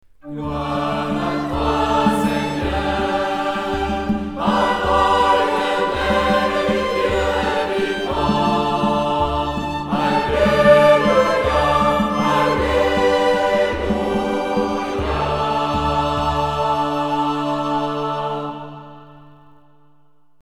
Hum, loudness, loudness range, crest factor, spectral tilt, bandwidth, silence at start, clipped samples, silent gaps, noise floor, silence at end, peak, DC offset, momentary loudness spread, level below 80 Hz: none; -18 LUFS; 5 LU; 18 dB; -5.5 dB/octave; 15.5 kHz; 0.25 s; under 0.1%; none; -61 dBFS; 1.2 s; 0 dBFS; 0.4%; 7 LU; -34 dBFS